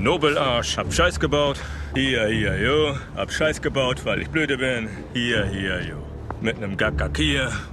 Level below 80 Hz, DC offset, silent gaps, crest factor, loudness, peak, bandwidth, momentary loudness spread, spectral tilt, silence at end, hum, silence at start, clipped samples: -36 dBFS; under 0.1%; none; 18 dB; -23 LUFS; -6 dBFS; 13.5 kHz; 8 LU; -4.5 dB/octave; 0 s; none; 0 s; under 0.1%